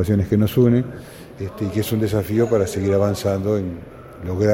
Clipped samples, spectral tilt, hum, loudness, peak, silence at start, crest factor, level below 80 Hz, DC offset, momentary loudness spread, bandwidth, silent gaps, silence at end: under 0.1%; -7.5 dB/octave; none; -20 LUFS; -4 dBFS; 0 s; 16 dB; -44 dBFS; under 0.1%; 17 LU; 16.5 kHz; none; 0 s